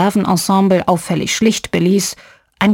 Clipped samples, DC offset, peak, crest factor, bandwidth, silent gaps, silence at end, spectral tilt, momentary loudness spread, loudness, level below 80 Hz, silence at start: under 0.1%; under 0.1%; 0 dBFS; 14 dB; 17 kHz; none; 0 s; -5 dB/octave; 5 LU; -15 LUFS; -48 dBFS; 0 s